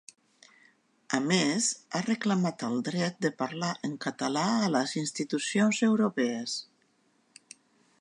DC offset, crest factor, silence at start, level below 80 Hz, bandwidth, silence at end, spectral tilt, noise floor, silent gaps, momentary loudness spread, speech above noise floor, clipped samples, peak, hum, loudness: under 0.1%; 20 dB; 1.1 s; -80 dBFS; 11 kHz; 1.4 s; -4 dB/octave; -69 dBFS; none; 8 LU; 41 dB; under 0.1%; -10 dBFS; none; -29 LUFS